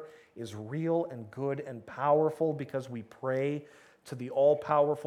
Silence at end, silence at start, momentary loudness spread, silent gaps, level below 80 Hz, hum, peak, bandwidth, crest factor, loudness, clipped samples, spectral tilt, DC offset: 0 s; 0 s; 16 LU; none; -78 dBFS; none; -14 dBFS; 12 kHz; 18 dB; -31 LUFS; under 0.1%; -7.5 dB/octave; under 0.1%